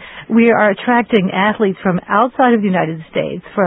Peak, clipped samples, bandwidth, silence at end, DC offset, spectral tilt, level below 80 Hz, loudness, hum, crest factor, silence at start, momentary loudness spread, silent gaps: 0 dBFS; under 0.1%; 4 kHz; 0 s; under 0.1%; -10 dB/octave; -54 dBFS; -14 LUFS; none; 14 dB; 0 s; 9 LU; none